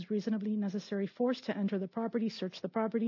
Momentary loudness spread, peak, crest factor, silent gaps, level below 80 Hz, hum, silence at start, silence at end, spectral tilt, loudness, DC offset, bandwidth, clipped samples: 3 LU; -20 dBFS; 14 dB; none; -90 dBFS; none; 0 s; 0 s; -6 dB/octave; -35 LUFS; under 0.1%; 6 kHz; under 0.1%